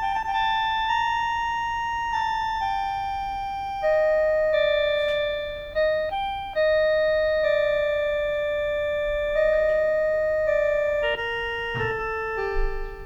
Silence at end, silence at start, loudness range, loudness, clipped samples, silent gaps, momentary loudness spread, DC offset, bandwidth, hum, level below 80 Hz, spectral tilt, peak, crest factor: 0 s; 0 s; 2 LU; -24 LUFS; under 0.1%; none; 6 LU; under 0.1%; 7.6 kHz; none; -38 dBFS; -4 dB/octave; -12 dBFS; 12 dB